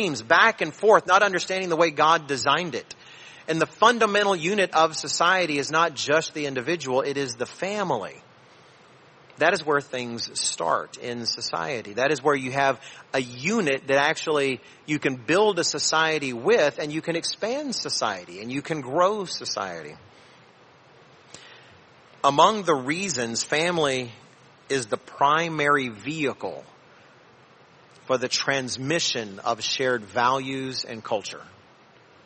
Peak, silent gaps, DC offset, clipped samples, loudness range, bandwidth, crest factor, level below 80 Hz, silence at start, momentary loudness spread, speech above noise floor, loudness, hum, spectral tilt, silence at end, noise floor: -2 dBFS; none; under 0.1%; under 0.1%; 6 LU; 8.8 kHz; 22 dB; -70 dBFS; 0 s; 11 LU; 30 dB; -23 LUFS; none; -3 dB/octave; 0.8 s; -54 dBFS